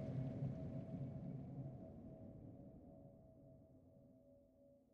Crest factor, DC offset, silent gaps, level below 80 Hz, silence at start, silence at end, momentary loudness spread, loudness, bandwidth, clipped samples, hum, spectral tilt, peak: 18 dB; under 0.1%; none; -70 dBFS; 0 s; 0.1 s; 21 LU; -51 LUFS; 4.8 kHz; under 0.1%; none; -11 dB/octave; -34 dBFS